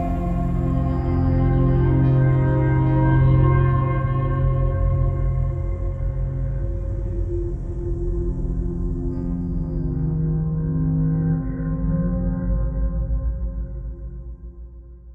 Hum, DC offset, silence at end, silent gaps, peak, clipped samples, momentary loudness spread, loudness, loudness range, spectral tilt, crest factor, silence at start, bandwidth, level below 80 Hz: none; under 0.1%; 0 s; none; -6 dBFS; under 0.1%; 11 LU; -22 LUFS; 8 LU; -11.5 dB/octave; 14 dB; 0 s; 3.3 kHz; -26 dBFS